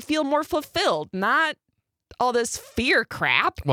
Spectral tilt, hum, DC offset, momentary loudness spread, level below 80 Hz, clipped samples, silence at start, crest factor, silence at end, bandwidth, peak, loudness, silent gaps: -3.5 dB/octave; none; under 0.1%; 6 LU; -52 dBFS; under 0.1%; 0 s; 20 dB; 0 s; 19 kHz; -4 dBFS; -23 LUFS; none